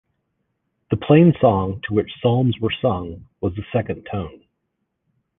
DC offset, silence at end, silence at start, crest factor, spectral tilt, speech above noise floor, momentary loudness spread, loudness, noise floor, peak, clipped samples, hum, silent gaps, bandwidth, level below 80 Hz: under 0.1%; 1.1 s; 0.9 s; 18 dB; -11 dB/octave; 56 dB; 15 LU; -20 LUFS; -75 dBFS; -2 dBFS; under 0.1%; none; none; 3.9 kHz; -44 dBFS